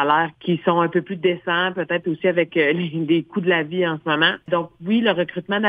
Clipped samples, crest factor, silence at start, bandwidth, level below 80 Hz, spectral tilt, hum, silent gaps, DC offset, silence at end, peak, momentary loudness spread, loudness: under 0.1%; 18 dB; 0 s; 4.9 kHz; -66 dBFS; -8.5 dB/octave; none; none; under 0.1%; 0 s; -2 dBFS; 5 LU; -20 LUFS